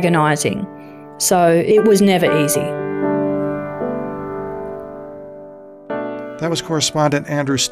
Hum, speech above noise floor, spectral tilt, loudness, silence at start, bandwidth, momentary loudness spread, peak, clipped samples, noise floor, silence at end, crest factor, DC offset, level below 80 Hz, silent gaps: none; 22 dB; -4.5 dB/octave; -17 LUFS; 0 s; 15.5 kHz; 20 LU; -4 dBFS; under 0.1%; -37 dBFS; 0 s; 14 dB; 0.2%; -54 dBFS; none